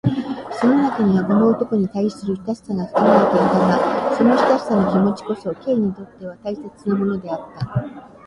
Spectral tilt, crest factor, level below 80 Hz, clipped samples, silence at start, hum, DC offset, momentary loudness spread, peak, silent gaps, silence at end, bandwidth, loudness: -8 dB/octave; 16 dB; -52 dBFS; under 0.1%; 0.05 s; none; under 0.1%; 13 LU; -2 dBFS; none; 0.2 s; 11 kHz; -19 LUFS